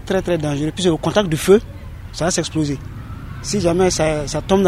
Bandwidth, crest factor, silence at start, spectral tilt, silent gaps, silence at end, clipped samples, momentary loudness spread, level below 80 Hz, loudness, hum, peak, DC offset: 15.5 kHz; 18 dB; 0 s; -5 dB/octave; none; 0 s; under 0.1%; 17 LU; -36 dBFS; -18 LUFS; none; 0 dBFS; under 0.1%